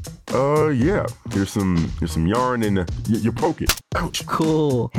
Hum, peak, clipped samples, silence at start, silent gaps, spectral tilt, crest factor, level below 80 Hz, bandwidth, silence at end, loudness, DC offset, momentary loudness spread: none; -6 dBFS; under 0.1%; 0 s; none; -5.5 dB/octave; 14 dB; -36 dBFS; 19 kHz; 0 s; -21 LUFS; under 0.1%; 6 LU